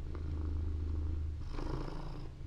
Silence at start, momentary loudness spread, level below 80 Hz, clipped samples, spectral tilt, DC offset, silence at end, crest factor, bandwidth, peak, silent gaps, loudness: 0 s; 6 LU; -40 dBFS; under 0.1%; -8 dB/octave; under 0.1%; 0 s; 10 dB; 7 kHz; -26 dBFS; none; -41 LUFS